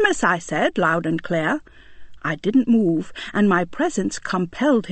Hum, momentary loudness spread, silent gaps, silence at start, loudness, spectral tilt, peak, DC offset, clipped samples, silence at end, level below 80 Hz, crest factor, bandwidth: none; 7 LU; none; 0 s; -21 LUFS; -5.5 dB/octave; -4 dBFS; under 0.1%; under 0.1%; 0 s; -50 dBFS; 16 dB; 8.8 kHz